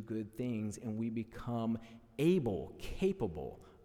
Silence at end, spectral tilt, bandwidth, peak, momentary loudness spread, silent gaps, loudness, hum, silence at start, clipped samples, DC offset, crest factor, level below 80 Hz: 0 s; -7.5 dB/octave; 16.5 kHz; -18 dBFS; 13 LU; none; -37 LUFS; none; 0 s; under 0.1%; under 0.1%; 18 dB; -54 dBFS